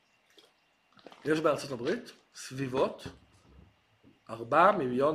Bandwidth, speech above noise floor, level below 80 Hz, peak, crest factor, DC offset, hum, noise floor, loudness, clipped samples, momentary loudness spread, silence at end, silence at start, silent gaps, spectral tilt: 15 kHz; 40 dB; -66 dBFS; -10 dBFS; 22 dB; under 0.1%; none; -69 dBFS; -29 LUFS; under 0.1%; 22 LU; 0 s; 1.25 s; none; -5.5 dB/octave